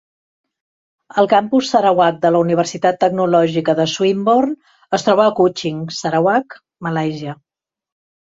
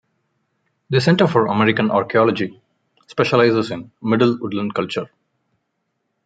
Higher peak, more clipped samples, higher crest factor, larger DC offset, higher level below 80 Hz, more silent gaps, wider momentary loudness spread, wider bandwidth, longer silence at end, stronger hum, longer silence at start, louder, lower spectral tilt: about the same, -2 dBFS vs -2 dBFS; neither; about the same, 16 dB vs 18 dB; neither; about the same, -60 dBFS vs -62 dBFS; neither; about the same, 10 LU vs 12 LU; second, 7.8 kHz vs 9.2 kHz; second, 0.95 s vs 1.2 s; neither; first, 1.15 s vs 0.9 s; about the same, -16 LUFS vs -18 LUFS; second, -5.5 dB/octave vs -7 dB/octave